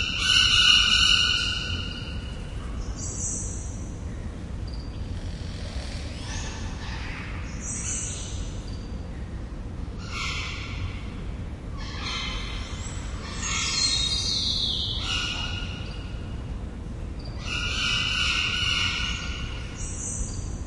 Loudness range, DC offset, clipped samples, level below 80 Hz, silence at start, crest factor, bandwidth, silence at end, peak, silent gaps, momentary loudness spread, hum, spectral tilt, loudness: 10 LU; under 0.1%; under 0.1%; -36 dBFS; 0 s; 22 dB; 11.5 kHz; 0 s; -6 dBFS; none; 17 LU; none; -2 dB/octave; -26 LUFS